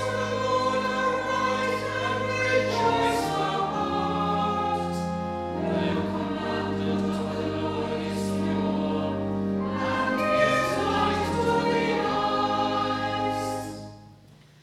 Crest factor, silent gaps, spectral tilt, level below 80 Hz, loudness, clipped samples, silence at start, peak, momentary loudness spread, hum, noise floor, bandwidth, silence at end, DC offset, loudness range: 18 dB; none; -5.5 dB/octave; -54 dBFS; -26 LUFS; under 0.1%; 0 s; -10 dBFS; 6 LU; none; -52 dBFS; 15 kHz; 0.3 s; under 0.1%; 3 LU